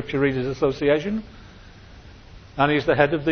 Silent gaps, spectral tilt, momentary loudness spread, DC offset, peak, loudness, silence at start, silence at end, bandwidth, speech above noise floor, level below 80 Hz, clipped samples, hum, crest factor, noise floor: none; -7 dB/octave; 12 LU; under 0.1%; -2 dBFS; -22 LUFS; 0 s; 0 s; 6.6 kHz; 23 dB; -46 dBFS; under 0.1%; none; 22 dB; -45 dBFS